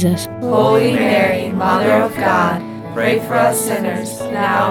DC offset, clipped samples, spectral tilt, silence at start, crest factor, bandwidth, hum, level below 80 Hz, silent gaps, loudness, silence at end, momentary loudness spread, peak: under 0.1%; under 0.1%; -5 dB/octave; 0 s; 14 dB; 19.5 kHz; none; -52 dBFS; none; -16 LUFS; 0 s; 8 LU; -2 dBFS